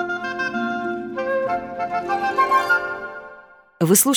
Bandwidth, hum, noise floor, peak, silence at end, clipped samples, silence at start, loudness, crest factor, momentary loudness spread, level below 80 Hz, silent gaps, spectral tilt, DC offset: 19.5 kHz; none; -46 dBFS; -2 dBFS; 0 s; under 0.1%; 0 s; -21 LUFS; 20 dB; 13 LU; -62 dBFS; none; -3.5 dB/octave; under 0.1%